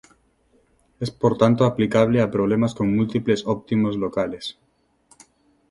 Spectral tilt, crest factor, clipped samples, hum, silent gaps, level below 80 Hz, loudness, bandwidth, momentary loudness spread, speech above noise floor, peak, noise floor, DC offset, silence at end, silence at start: -7.5 dB/octave; 20 dB; under 0.1%; none; none; -54 dBFS; -21 LUFS; 11.5 kHz; 11 LU; 42 dB; -2 dBFS; -62 dBFS; under 0.1%; 1.2 s; 1 s